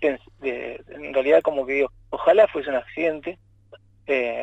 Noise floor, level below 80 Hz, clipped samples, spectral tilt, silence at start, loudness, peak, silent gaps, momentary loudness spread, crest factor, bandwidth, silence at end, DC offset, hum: -51 dBFS; -56 dBFS; under 0.1%; -6 dB/octave; 0 s; -22 LUFS; -6 dBFS; none; 16 LU; 18 dB; 7.8 kHz; 0 s; under 0.1%; none